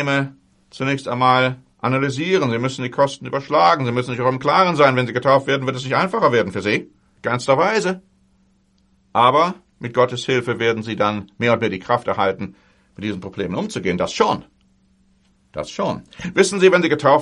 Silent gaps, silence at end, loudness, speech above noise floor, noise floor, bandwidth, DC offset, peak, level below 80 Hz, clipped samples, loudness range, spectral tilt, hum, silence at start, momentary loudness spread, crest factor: none; 0 s; -19 LUFS; 41 dB; -59 dBFS; 11.5 kHz; under 0.1%; -2 dBFS; -58 dBFS; under 0.1%; 6 LU; -5.5 dB/octave; none; 0 s; 12 LU; 18 dB